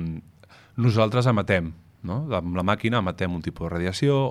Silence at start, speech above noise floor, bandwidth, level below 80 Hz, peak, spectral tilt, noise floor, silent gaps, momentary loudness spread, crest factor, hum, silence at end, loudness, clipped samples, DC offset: 0 s; 29 dB; 12 kHz; -48 dBFS; -6 dBFS; -7 dB/octave; -52 dBFS; none; 14 LU; 18 dB; none; 0 s; -24 LUFS; under 0.1%; under 0.1%